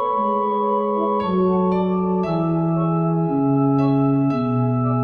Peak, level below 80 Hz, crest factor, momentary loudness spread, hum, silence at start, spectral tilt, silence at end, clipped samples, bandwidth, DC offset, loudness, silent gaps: -6 dBFS; -52 dBFS; 12 dB; 3 LU; none; 0 s; -11 dB/octave; 0 s; under 0.1%; 5 kHz; under 0.1%; -20 LUFS; none